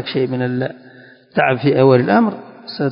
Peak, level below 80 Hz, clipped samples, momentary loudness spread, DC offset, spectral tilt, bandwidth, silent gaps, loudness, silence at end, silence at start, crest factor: 0 dBFS; -60 dBFS; under 0.1%; 14 LU; under 0.1%; -12 dB/octave; 5.4 kHz; none; -16 LUFS; 0 s; 0 s; 16 dB